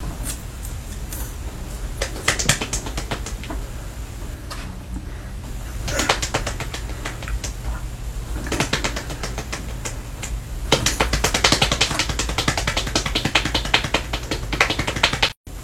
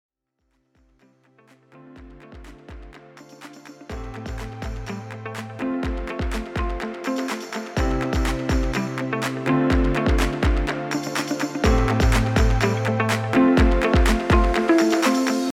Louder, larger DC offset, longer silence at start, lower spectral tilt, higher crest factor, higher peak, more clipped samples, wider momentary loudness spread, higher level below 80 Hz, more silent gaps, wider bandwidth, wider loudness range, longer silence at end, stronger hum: about the same, -23 LUFS vs -22 LUFS; neither; second, 0 s vs 1.75 s; second, -2.5 dB/octave vs -6 dB/octave; first, 24 dB vs 16 dB; first, 0 dBFS vs -8 dBFS; neither; about the same, 15 LU vs 16 LU; about the same, -30 dBFS vs -28 dBFS; first, 15.37-15.44 s vs none; first, 17 kHz vs 15 kHz; second, 8 LU vs 17 LU; about the same, 0 s vs 0 s; neither